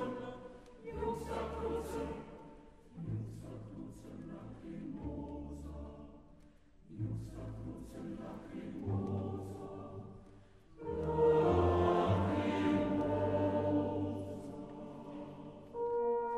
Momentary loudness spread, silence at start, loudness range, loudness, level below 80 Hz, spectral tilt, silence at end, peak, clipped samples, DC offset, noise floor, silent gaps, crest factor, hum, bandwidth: 19 LU; 0 s; 14 LU; -37 LUFS; -54 dBFS; -8 dB/octave; 0 s; -20 dBFS; under 0.1%; under 0.1%; -62 dBFS; none; 18 dB; none; 13 kHz